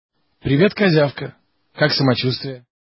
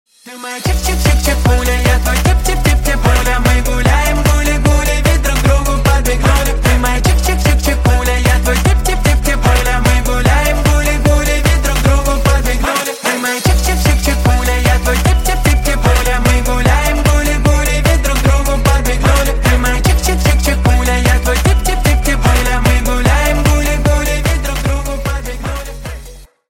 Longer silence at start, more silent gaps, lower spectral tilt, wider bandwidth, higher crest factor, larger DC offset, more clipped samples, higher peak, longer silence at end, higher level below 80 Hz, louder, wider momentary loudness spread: first, 0.45 s vs 0.25 s; neither; first, -9.5 dB/octave vs -4.5 dB/octave; second, 5.8 kHz vs 17 kHz; first, 18 dB vs 12 dB; neither; neither; about the same, -2 dBFS vs 0 dBFS; about the same, 0.3 s vs 0.25 s; second, -50 dBFS vs -14 dBFS; second, -18 LUFS vs -13 LUFS; first, 16 LU vs 3 LU